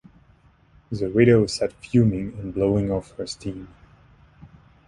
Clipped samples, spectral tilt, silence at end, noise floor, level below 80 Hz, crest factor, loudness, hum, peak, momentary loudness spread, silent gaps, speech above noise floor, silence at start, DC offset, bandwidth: under 0.1%; -7 dB/octave; 1.2 s; -56 dBFS; -46 dBFS; 20 dB; -22 LUFS; none; -4 dBFS; 16 LU; none; 35 dB; 0.9 s; under 0.1%; 11.5 kHz